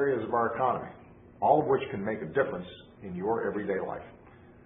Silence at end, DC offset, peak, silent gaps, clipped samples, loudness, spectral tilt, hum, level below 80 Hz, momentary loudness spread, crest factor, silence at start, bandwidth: 0.5 s; under 0.1%; -8 dBFS; none; under 0.1%; -30 LUFS; -10.5 dB/octave; none; -60 dBFS; 18 LU; 22 dB; 0 s; 3.8 kHz